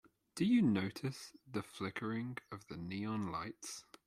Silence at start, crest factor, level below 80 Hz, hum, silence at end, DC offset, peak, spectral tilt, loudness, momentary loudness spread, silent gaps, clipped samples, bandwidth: 0.35 s; 16 dB; -72 dBFS; none; 0.25 s; under 0.1%; -22 dBFS; -5.5 dB/octave; -39 LUFS; 17 LU; none; under 0.1%; 14 kHz